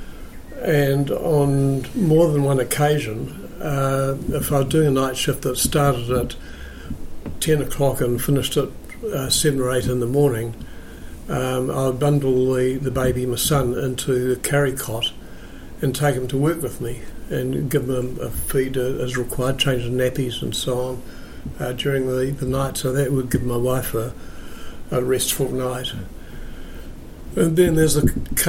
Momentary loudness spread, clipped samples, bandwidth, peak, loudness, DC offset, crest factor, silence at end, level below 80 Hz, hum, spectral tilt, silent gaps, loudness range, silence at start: 19 LU; under 0.1%; 16.5 kHz; -4 dBFS; -21 LUFS; under 0.1%; 16 dB; 0 s; -36 dBFS; none; -5 dB/octave; none; 4 LU; 0 s